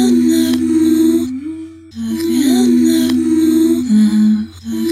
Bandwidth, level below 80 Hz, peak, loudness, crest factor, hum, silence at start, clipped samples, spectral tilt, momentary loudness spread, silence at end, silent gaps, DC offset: 15 kHz; -50 dBFS; -4 dBFS; -13 LUFS; 10 dB; none; 0 s; under 0.1%; -5.5 dB/octave; 13 LU; 0 s; none; under 0.1%